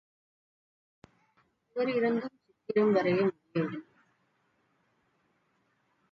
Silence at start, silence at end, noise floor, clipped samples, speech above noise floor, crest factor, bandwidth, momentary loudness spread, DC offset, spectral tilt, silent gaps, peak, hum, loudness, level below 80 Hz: 1.75 s; 2.3 s; -74 dBFS; under 0.1%; 46 dB; 18 dB; 6.2 kHz; 18 LU; under 0.1%; -8.5 dB/octave; none; -14 dBFS; none; -30 LUFS; -78 dBFS